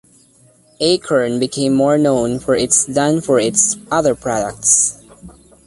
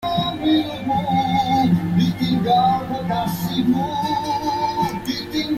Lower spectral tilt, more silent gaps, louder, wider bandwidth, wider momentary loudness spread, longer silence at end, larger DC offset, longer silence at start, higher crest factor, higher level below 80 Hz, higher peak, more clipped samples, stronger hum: second, -3.5 dB/octave vs -6 dB/octave; neither; first, -15 LUFS vs -20 LUFS; second, 11.5 kHz vs 15.5 kHz; about the same, 6 LU vs 6 LU; first, 0.35 s vs 0 s; neither; first, 0.8 s vs 0 s; about the same, 16 dB vs 14 dB; about the same, -48 dBFS vs -46 dBFS; first, 0 dBFS vs -6 dBFS; neither; neither